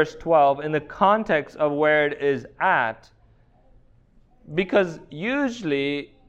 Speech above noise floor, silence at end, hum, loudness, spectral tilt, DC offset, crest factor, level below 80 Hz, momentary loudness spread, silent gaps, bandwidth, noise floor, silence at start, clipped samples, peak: 34 dB; 0.25 s; none; -22 LUFS; -6 dB/octave; under 0.1%; 18 dB; -56 dBFS; 9 LU; none; 8.2 kHz; -56 dBFS; 0 s; under 0.1%; -4 dBFS